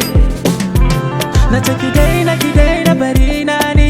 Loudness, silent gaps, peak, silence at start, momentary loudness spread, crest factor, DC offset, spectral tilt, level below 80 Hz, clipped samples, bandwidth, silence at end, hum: -13 LUFS; none; 0 dBFS; 0 s; 3 LU; 10 dB; under 0.1%; -5.5 dB/octave; -14 dBFS; 0.2%; 16.5 kHz; 0 s; none